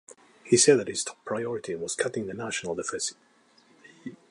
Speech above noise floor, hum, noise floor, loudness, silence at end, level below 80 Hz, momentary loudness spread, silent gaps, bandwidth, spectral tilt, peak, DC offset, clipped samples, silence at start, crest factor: 34 dB; none; -61 dBFS; -27 LUFS; 0.15 s; -68 dBFS; 13 LU; none; 11.5 kHz; -3 dB/octave; -6 dBFS; under 0.1%; under 0.1%; 0.45 s; 22 dB